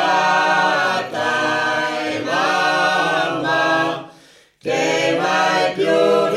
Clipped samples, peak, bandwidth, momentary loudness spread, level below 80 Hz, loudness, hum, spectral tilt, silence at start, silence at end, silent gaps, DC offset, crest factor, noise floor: under 0.1%; -4 dBFS; 15 kHz; 6 LU; -66 dBFS; -17 LUFS; none; -3.5 dB/octave; 0 s; 0 s; none; under 0.1%; 14 dB; -49 dBFS